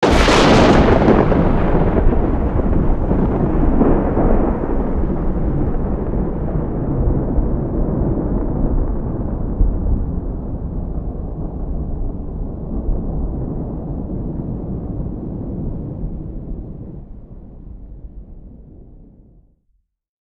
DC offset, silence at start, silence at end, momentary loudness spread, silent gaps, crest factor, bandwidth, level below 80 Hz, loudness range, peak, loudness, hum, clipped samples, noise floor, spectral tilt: under 0.1%; 0 s; 1.3 s; 18 LU; none; 16 dB; 10 kHz; -20 dBFS; 14 LU; 0 dBFS; -19 LUFS; none; under 0.1%; -64 dBFS; -7 dB/octave